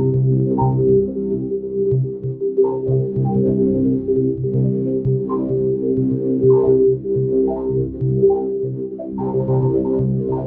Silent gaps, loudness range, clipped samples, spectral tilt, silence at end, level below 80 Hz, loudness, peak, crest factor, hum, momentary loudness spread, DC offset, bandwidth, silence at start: none; 2 LU; under 0.1%; -15.5 dB/octave; 0 s; -42 dBFS; -18 LUFS; -4 dBFS; 14 dB; none; 7 LU; under 0.1%; 1.5 kHz; 0 s